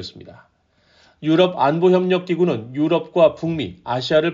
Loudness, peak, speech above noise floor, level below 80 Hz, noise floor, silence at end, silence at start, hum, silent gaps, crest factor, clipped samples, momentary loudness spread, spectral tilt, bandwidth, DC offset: -19 LUFS; -2 dBFS; 40 dB; -58 dBFS; -58 dBFS; 0 s; 0 s; none; none; 16 dB; under 0.1%; 9 LU; -5 dB/octave; 7.4 kHz; under 0.1%